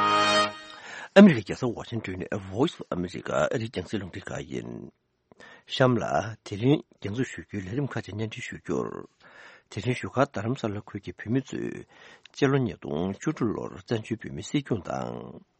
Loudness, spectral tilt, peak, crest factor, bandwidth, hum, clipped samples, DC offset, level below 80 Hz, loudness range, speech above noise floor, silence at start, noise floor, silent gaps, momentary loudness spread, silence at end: -27 LUFS; -6 dB/octave; -2 dBFS; 26 dB; 8.4 kHz; none; under 0.1%; under 0.1%; -60 dBFS; 8 LU; 24 dB; 0 s; -51 dBFS; none; 15 LU; 0.2 s